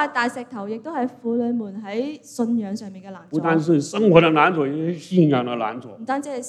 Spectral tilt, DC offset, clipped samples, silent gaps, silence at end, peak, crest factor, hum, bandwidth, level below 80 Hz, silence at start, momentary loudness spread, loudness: -6.5 dB/octave; under 0.1%; under 0.1%; none; 0 s; 0 dBFS; 20 dB; none; 12.5 kHz; -64 dBFS; 0 s; 15 LU; -21 LUFS